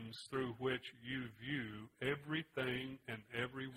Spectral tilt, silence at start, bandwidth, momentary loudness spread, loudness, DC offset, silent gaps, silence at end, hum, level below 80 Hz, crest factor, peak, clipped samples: -5.5 dB/octave; 0 s; 16 kHz; 5 LU; -43 LUFS; under 0.1%; none; 0 s; none; -72 dBFS; 20 dB; -24 dBFS; under 0.1%